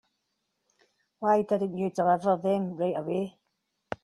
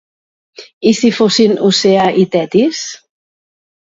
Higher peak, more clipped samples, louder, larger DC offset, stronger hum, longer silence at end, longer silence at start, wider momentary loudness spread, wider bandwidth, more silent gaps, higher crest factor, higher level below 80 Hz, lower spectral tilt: second, -12 dBFS vs 0 dBFS; neither; second, -28 LUFS vs -12 LUFS; neither; neither; second, 0.1 s vs 0.9 s; first, 1.2 s vs 0.6 s; about the same, 8 LU vs 6 LU; first, 12 kHz vs 7.8 kHz; second, none vs 0.73-0.81 s; about the same, 18 dB vs 14 dB; second, -70 dBFS vs -56 dBFS; first, -8 dB/octave vs -4.5 dB/octave